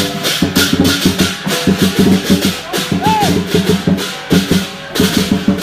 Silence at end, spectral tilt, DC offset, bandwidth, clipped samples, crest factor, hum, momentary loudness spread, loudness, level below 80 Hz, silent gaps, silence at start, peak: 0 s; -4.5 dB/octave; under 0.1%; 16 kHz; under 0.1%; 14 dB; none; 5 LU; -13 LUFS; -38 dBFS; none; 0 s; 0 dBFS